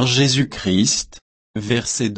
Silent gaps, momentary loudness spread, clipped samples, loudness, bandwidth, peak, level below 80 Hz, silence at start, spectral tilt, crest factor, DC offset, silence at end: 1.22-1.54 s; 15 LU; under 0.1%; -18 LUFS; 8.8 kHz; -4 dBFS; -48 dBFS; 0 s; -4 dB/octave; 16 dB; under 0.1%; 0 s